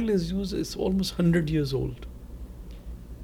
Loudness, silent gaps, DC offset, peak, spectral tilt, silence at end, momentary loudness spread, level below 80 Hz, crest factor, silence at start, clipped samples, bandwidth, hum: -27 LUFS; none; under 0.1%; -12 dBFS; -6.5 dB/octave; 0 s; 20 LU; -40 dBFS; 16 dB; 0 s; under 0.1%; 16 kHz; none